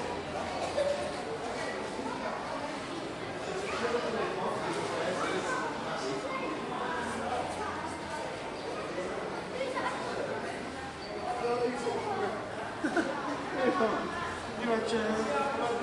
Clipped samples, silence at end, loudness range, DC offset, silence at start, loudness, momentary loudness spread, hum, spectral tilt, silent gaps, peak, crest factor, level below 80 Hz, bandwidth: under 0.1%; 0 s; 4 LU; under 0.1%; 0 s; -34 LUFS; 7 LU; none; -4.5 dB/octave; none; -14 dBFS; 20 dB; -62 dBFS; 11.5 kHz